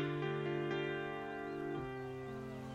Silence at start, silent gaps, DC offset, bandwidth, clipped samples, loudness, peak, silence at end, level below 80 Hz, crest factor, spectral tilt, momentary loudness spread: 0 s; none; under 0.1%; 13.5 kHz; under 0.1%; -41 LUFS; -26 dBFS; 0 s; -66 dBFS; 14 dB; -7 dB/octave; 7 LU